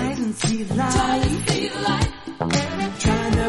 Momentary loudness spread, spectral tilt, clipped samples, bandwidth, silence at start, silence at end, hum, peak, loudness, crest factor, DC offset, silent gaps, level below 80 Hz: 5 LU; -5 dB/octave; under 0.1%; 11.5 kHz; 0 s; 0 s; none; -4 dBFS; -22 LUFS; 18 dB; under 0.1%; none; -34 dBFS